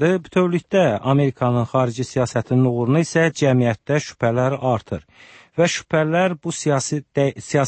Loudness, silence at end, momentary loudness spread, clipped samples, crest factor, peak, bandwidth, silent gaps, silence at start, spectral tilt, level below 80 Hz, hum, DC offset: -20 LUFS; 0 s; 5 LU; under 0.1%; 14 dB; -4 dBFS; 8.8 kHz; none; 0 s; -6 dB/octave; -54 dBFS; none; under 0.1%